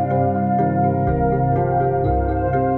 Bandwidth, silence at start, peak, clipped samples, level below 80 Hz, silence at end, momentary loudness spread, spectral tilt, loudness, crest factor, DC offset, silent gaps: 4.1 kHz; 0 s; -6 dBFS; under 0.1%; -30 dBFS; 0 s; 1 LU; -12.5 dB/octave; -19 LUFS; 12 dB; under 0.1%; none